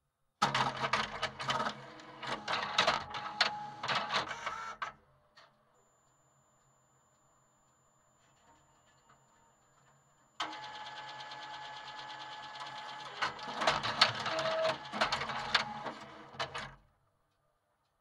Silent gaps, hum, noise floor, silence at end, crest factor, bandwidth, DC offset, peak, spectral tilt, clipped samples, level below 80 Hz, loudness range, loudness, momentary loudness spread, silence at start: none; none; -78 dBFS; 1.25 s; 30 dB; 16 kHz; under 0.1%; -8 dBFS; -2.5 dB/octave; under 0.1%; -70 dBFS; 15 LU; -35 LUFS; 15 LU; 0.4 s